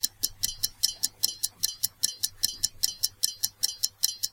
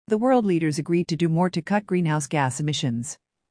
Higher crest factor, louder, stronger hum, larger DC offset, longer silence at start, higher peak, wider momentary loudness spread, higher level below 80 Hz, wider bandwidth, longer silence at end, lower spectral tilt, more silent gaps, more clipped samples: first, 28 dB vs 14 dB; second, -27 LUFS vs -23 LUFS; neither; neither; about the same, 0 s vs 0.1 s; first, -2 dBFS vs -10 dBFS; second, 2 LU vs 7 LU; first, -56 dBFS vs -64 dBFS; first, 17 kHz vs 10.5 kHz; second, 0.05 s vs 0.35 s; second, 2 dB/octave vs -6 dB/octave; neither; neither